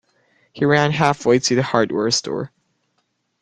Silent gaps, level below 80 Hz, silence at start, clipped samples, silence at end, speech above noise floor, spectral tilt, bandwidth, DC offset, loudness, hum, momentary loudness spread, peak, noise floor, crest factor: none; -56 dBFS; 0.55 s; under 0.1%; 0.95 s; 52 dB; -4.5 dB/octave; 10 kHz; under 0.1%; -18 LUFS; none; 11 LU; 0 dBFS; -70 dBFS; 20 dB